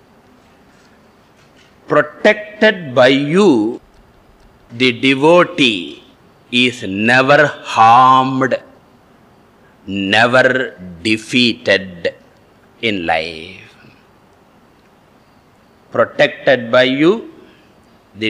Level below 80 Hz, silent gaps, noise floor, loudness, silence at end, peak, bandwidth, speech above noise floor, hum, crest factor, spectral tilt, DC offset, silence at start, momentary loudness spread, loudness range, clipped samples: -56 dBFS; none; -49 dBFS; -13 LUFS; 0 s; 0 dBFS; 11.5 kHz; 36 dB; none; 16 dB; -5 dB/octave; under 0.1%; 1.9 s; 13 LU; 10 LU; under 0.1%